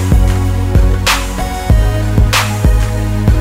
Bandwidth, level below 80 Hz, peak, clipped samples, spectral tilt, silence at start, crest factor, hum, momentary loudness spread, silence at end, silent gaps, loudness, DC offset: 16.5 kHz; -14 dBFS; 0 dBFS; under 0.1%; -5 dB/octave; 0 s; 10 dB; none; 3 LU; 0 s; none; -13 LUFS; under 0.1%